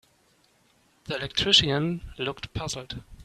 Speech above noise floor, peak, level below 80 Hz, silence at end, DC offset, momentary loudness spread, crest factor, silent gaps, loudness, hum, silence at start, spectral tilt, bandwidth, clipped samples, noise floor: 37 dB; -4 dBFS; -48 dBFS; 0 s; under 0.1%; 16 LU; 24 dB; none; -25 LUFS; none; 1.05 s; -3.5 dB/octave; 13.5 kHz; under 0.1%; -64 dBFS